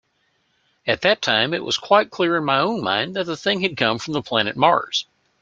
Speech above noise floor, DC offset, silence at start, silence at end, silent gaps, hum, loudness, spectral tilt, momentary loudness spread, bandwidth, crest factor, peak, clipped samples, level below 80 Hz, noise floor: 47 dB; under 0.1%; 0.85 s; 0.4 s; none; none; -20 LUFS; -4 dB/octave; 8 LU; 7.8 kHz; 20 dB; 0 dBFS; under 0.1%; -62 dBFS; -67 dBFS